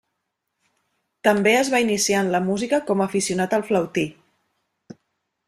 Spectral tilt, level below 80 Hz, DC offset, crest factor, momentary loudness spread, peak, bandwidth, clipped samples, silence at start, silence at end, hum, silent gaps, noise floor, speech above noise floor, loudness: -4 dB/octave; -62 dBFS; under 0.1%; 20 dB; 5 LU; -4 dBFS; 15.5 kHz; under 0.1%; 1.25 s; 1.35 s; none; none; -78 dBFS; 58 dB; -21 LUFS